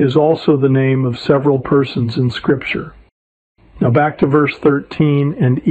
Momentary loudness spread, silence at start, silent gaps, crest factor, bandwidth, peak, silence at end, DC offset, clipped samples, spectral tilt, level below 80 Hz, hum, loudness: 5 LU; 0 s; 3.12-3.55 s; 14 dB; 8 kHz; 0 dBFS; 0 s; under 0.1%; under 0.1%; -9 dB/octave; -48 dBFS; none; -15 LUFS